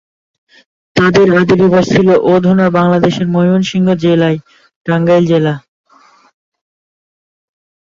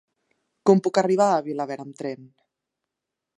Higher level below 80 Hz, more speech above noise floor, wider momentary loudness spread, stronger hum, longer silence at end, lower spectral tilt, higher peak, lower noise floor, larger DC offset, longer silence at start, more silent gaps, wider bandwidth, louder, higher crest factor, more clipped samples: first, -46 dBFS vs -78 dBFS; second, 37 dB vs 63 dB; second, 8 LU vs 14 LU; neither; first, 2.35 s vs 1.1 s; about the same, -7 dB/octave vs -6.5 dB/octave; first, 0 dBFS vs -4 dBFS; second, -47 dBFS vs -85 dBFS; neither; first, 0.95 s vs 0.65 s; first, 4.76-4.85 s vs none; second, 7.4 kHz vs 11 kHz; first, -11 LUFS vs -22 LUFS; second, 12 dB vs 22 dB; neither